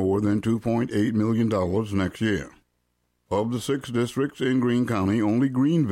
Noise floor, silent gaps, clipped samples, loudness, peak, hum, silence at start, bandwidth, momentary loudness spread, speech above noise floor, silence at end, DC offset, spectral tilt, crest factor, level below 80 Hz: -73 dBFS; none; under 0.1%; -24 LUFS; -10 dBFS; none; 0 s; 16 kHz; 5 LU; 49 dB; 0 s; under 0.1%; -7 dB/octave; 12 dB; -54 dBFS